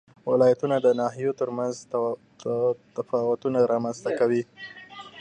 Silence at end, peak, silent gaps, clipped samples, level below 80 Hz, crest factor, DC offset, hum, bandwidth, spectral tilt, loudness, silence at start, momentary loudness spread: 0 s; -8 dBFS; none; under 0.1%; -74 dBFS; 18 dB; under 0.1%; none; 9.4 kHz; -6.5 dB/octave; -25 LUFS; 0.25 s; 14 LU